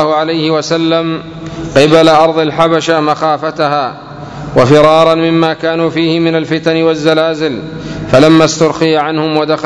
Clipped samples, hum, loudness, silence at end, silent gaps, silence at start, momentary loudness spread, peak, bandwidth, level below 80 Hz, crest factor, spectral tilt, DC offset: 2%; none; -10 LUFS; 0 s; none; 0 s; 14 LU; 0 dBFS; 11 kHz; -42 dBFS; 10 dB; -5.5 dB/octave; under 0.1%